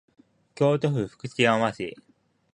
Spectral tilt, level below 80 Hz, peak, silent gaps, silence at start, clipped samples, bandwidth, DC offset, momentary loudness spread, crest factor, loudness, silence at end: -6 dB/octave; -62 dBFS; -6 dBFS; none; 0.6 s; under 0.1%; 10.5 kHz; under 0.1%; 12 LU; 22 dB; -25 LUFS; 0.6 s